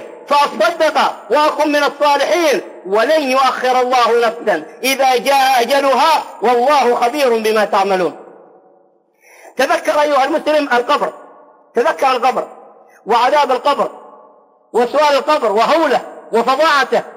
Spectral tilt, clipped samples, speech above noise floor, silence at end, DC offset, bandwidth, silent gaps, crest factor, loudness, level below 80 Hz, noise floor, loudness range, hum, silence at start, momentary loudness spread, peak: -2.5 dB/octave; under 0.1%; 40 dB; 0.05 s; under 0.1%; 16 kHz; none; 10 dB; -14 LUFS; -66 dBFS; -53 dBFS; 4 LU; none; 0 s; 7 LU; -4 dBFS